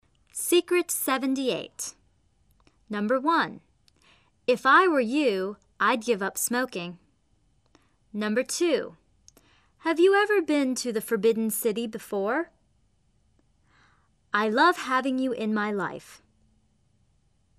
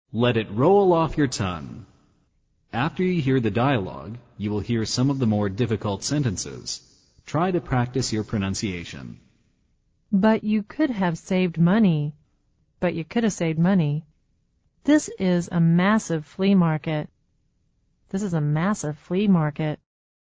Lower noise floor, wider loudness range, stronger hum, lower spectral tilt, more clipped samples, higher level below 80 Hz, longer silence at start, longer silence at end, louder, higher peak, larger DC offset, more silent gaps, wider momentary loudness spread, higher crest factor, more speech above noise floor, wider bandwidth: about the same, -67 dBFS vs -67 dBFS; about the same, 6 LU vs 4 LU; neither; second, -3.5 dB/octave vs -6.5 dB/octave; neither; second, -70 dBFS vs -50 dBFS; first, 0.35 s vs 0.15 s; first, 1.45 s vs 0.5 s; about the same, -25 LUFS vs -23 LUFS; about the same, -6 dBFS vs -6 dBFS; neither; neither; about the same, 14 LU vs 13 LU; about the same, 20 dB vs 16 dB; about the same, 43 dB vs 45 dB; first, 14 kHz vs 8 kHz